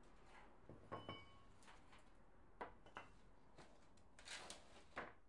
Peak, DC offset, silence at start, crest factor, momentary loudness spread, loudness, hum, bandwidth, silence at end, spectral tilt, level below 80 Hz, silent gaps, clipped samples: -36 dBFS; under 0.1%; 0 s; 24 dB; 13 LU; -59 LUFS; none; 11 kHz; 0 s; -3 dB/octave; -74 dBFS; none; under 0.1%